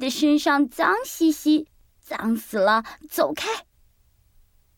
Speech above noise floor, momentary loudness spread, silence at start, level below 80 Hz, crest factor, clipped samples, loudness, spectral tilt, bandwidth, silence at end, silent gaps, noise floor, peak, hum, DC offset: 39 dB; 11 LU; 0 s; -60 dBFS; 18 dB; under 0.1%; -22 LUFS; -3.5 dB/octave; 18 kHz; 1.15 s; none; -61 dBFS; -6 dBFS; none; under 0.1%